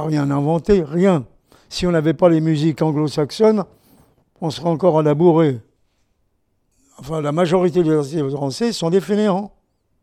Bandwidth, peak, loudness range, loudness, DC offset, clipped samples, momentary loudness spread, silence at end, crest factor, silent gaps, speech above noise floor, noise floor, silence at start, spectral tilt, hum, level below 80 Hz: 13.5 kHz; -2 dBFS; 3 LU; -18 LUFS; under 0.1%; under 0.1%; 10 LU; 0.55 s; 18 dB; none; 49 dB; -66 dBFS; 0 s; -7 dB/octave; none; -46 dBFS